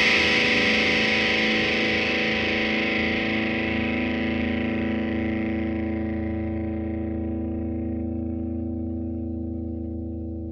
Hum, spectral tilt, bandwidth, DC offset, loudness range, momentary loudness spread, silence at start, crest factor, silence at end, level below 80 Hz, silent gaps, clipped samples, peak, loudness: none; -5 dB/octave; 9 kHz; under 0.1%; 9 LU; 12 LU; 0 s; 18 dB; 0 s; -44 dBFS; none; under 0.1%; -8 dBFS; -24 LUFS